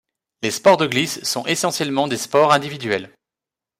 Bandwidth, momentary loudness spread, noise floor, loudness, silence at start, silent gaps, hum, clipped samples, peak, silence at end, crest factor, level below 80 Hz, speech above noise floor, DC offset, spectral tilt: 16 kHz; 9 LU; -88 dBFS; -19 LUFS; 0.4 s; none; none; under 0.1%; -2 dBFS; 0.7 s; 18 dB; -62 dBFS; 69 dB; under 0.1%; -3.5 dB/octave